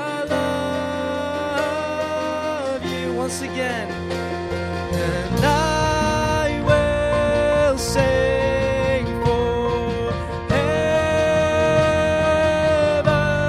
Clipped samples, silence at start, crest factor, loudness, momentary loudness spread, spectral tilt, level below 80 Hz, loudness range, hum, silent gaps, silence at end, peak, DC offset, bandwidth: under 0.1%; 0 s; 18 dB; -20 LUFS; 7 LU; -5.5 dB/octave; -34 dBFS; 5 LU; none; none; 0 s; -2 dBFS; under 0.1%; 15 kHz